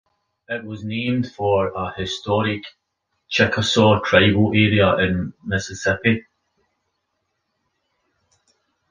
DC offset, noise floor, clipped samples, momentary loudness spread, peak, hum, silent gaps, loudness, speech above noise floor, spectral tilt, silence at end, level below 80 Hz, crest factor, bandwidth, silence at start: under 0.1%; -75 dBFS; under 0.1%; 13 LU; -2 dBFS; none; none; -19 LUFS; 56 dB; -5.5 dB/octave; 2.7 s; -44 dBFS; 20 dB; 9.8 kHz; 0.5 s